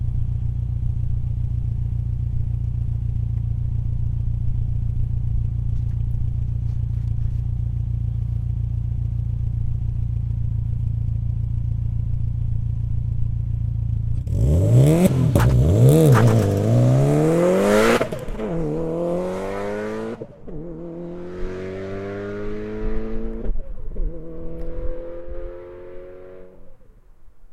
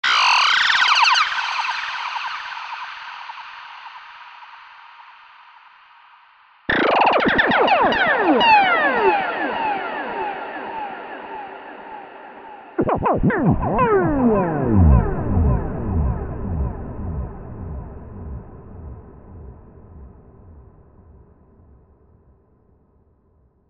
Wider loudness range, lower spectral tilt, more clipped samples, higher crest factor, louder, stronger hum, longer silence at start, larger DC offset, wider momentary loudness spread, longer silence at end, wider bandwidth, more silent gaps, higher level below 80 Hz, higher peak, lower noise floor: second, 15 LU vs 21 LU; first, -8 dB/octave vs -5 dB/octave; neither; about the same, 20 dB vs 18 dB; second, -22 LUFS vs -18 LUFS; neither; about the same, 0 s vs 0.05 s; neither; second, 17 LU vs 23 LU; second, 0 s vs 3.1 s; first, 15 kHz vs 8.6 kHz; neither; about the same, -28 dBFS vs -32 dBFS; about the same, 0 dBFS vs -2 dBFS; second, -45 dBFS vs -59 dBFS